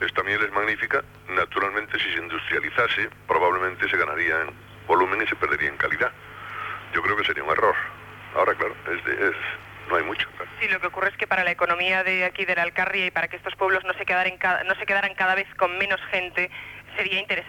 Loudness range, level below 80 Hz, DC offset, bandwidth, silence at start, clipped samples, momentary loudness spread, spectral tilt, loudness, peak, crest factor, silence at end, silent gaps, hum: 2 LU; -56 dBFS; under 0.1%; 19 kHz; 0 s; under 0.1%; 8 LU; -4.5 dB/octave; -23 LUFS; -8 dBFS; 16 dB; 0 s; none; none